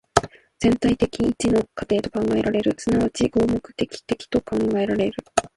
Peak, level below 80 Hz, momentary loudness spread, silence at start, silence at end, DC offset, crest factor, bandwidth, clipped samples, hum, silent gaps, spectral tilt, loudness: 0 dBFS; -44 dBFS; 6 LU; 0.15 s; 0.1 s; under 0.1%; 22 dB; 11.5 kHz; under 0.1%; none; none; -5.5 dB/octave; -22 LUFS